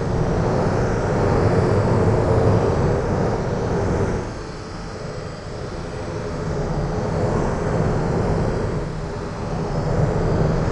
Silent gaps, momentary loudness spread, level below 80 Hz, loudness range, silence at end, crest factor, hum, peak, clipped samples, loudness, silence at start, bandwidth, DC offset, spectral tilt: none; 13 LU; -30 dBFS; 7 LU; 0 s; 16 dB; none; -4 dBFS; under 0.1%; -22 LUFS; 0 s; 10 kHz; under 0.1%; -7.5 dB/octave